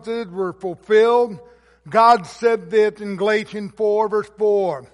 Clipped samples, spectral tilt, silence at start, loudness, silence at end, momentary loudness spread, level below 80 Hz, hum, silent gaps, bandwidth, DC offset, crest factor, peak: under 0.1%; -5.5 dB/octave; 0.05 s; -19 LUFS; 0.1 s; 12 LU; -62 dBFS; none; none; 11.5 kHz; under 0.1%; 16 dB; -2 dBFS